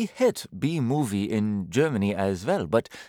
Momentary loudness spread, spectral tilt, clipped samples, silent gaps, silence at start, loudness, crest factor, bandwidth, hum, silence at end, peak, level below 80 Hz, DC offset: 3 LU; -6.5 dB/octave; under 0.1%; none; 0 s; -26 LUFS; 18 dB; 17.5 kHz; none; 0 s; -8 dBFS; -62 dBFS; under 0.1%